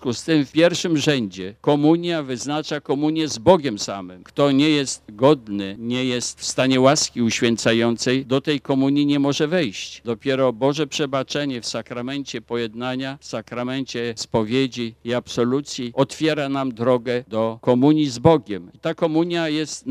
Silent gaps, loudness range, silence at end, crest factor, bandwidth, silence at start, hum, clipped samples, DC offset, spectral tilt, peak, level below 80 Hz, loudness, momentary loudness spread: none; 6 LU; 0 s; 20 dB; 13.5 kHz; 0 s; none; under 0.1%; under 0.1%; -5 dB/octave; 0 dBFS; -56 dBFS; -21 LUFS; 11 LU